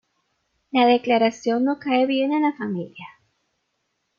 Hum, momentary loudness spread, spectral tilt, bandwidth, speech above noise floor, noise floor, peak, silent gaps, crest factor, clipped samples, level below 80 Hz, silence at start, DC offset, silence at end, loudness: none; 12 LU; -5.5 dB/octave; 7.2 kHz; 54 dB; -74 dBFS; -6 dBFS; none; 18 dB; under 0.1%; -70 dBFS; 0.75 s; under 0.1%; 1.1 s; -21 LUFS